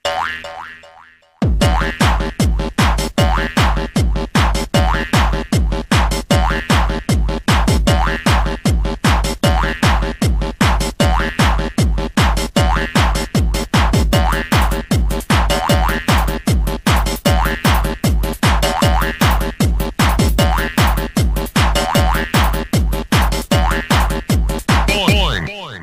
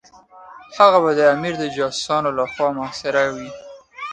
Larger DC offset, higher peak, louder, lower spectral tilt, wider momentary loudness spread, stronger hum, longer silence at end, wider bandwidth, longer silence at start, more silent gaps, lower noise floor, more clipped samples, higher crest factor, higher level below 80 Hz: neither; about the same, 0 dBFS vs 0 dBFS; about the same, -16 LUFS vs -18 LUFS; about the same, -5 dB/octave vs -4 dB/octave; second, 3 LU vs 19 LU; neither; about the same, 0 s vs 0 s; first, 16 kHz vs 9.4 kHz; second, 0.05 s vs 0.35 s; neither; about the same, -45 dBFS vs -45 dBFS; neither; second, 14 dB vs 20 dB; first, -18 dBFS vs -58 dBFS